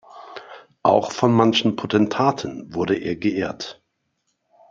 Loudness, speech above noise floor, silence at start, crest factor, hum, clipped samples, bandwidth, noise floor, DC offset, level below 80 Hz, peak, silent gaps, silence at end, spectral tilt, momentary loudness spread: -20 LUFS; 53 dB; 0.15 s; 22 dB; none; under 0.1%; 7.6 kHz; -73 dBFS; under 0.1%; -60 dBFS; 0 dBFS; none; 1 s; -6 dB/octave; 20 LU